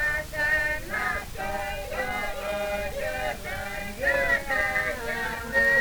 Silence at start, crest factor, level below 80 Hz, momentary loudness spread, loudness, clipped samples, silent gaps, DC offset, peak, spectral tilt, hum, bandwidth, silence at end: 0 s; 16 dB; -42 dBFS; 8 LU; -27 LUFS; under 0.1%; none; under 0.1%; -12 dBFS; -3.5 dB/octave; none; over 20 kHz; 0 s